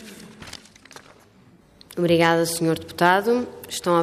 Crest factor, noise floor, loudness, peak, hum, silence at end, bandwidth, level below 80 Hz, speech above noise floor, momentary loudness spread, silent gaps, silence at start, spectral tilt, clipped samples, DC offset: 20 dB; -53 dBFS; -21 LUFS; -4 dBFS; none; 0 s; 15.5 kHz; -62 dBFS; 33 dB; 22 LU; none; 0 s; -4.5 dB/octave; under 0.1%; under 0.1%